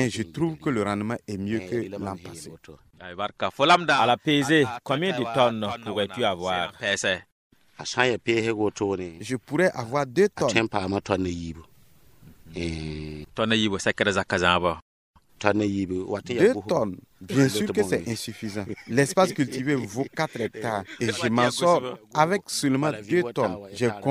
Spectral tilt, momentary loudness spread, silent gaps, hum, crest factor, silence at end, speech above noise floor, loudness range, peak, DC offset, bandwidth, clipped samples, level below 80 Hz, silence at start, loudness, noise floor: -4.5 dB/octave; 12 LU; 7.32-7.50 s, 14.82-15.14 s; none; 24 dB; 0 s; 33 dB; 5 LU; -2 dBFS; under 0.1%; 15.5 kHz; under 0.1%; -58 dBFS; 0 s; -25 LUFS; -58 dBFS